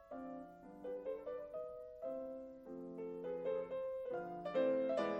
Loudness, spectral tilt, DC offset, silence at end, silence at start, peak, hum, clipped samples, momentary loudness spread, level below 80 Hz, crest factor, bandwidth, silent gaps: -44 LUFS; -7 dB/octave; under 0.1%; 0 s; 0 s; -26 dBFS; none; under 0.1%; 14 LU; -74 dBFS; 18 dB; 7.8 kHz; none